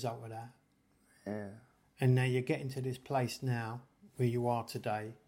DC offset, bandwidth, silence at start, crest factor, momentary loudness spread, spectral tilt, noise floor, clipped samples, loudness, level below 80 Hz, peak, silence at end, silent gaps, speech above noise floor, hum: under 0.1%; 16 kHz; 0 s; 18 dB; 18 LU; -7 dB/octave; -71 dBFS; under 0.1%; -36 LUFS; -72 dBFS; -18 dBFS; 0.15 s; none; 36 dB; none